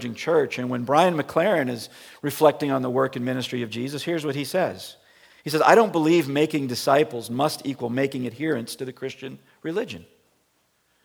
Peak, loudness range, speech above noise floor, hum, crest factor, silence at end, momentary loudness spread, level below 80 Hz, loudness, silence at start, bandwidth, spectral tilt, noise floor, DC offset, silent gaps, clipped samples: -2 dBFS; 7 LU; 44 dB; none; 22 dB; 1.05 s; 15 LU; -72 dBFS; -23 LUFS; 0 s; over 20 kHz; -5.5 dB/octave; -68 dBFS; under 0.1%; none; under 0.1%